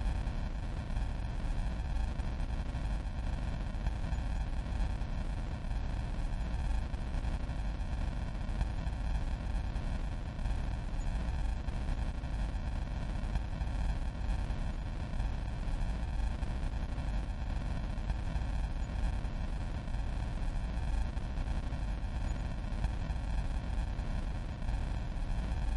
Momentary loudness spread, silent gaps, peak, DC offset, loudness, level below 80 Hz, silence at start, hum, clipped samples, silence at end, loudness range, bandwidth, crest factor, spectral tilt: 2 LU; none; -22 dBFS; under 0.1%; -39 LUFS; -36 dBFS; 0 s; none; under 0.1%; 0 s; 0 LU; 11 kHz; 14 dB; -7 dB/octave